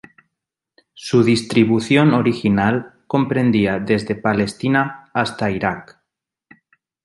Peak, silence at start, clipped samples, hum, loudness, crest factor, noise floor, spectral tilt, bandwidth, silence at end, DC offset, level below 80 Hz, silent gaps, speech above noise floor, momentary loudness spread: -2 dBFS; 1 s; under 0.1%; none; -18 LUFS; 18 dB; -82 dBFS; -6.5 dB/octave; 11.5 kHz; 1.2 s; under 0.1%; -50 dBFS; none; 65 dB; 8 LU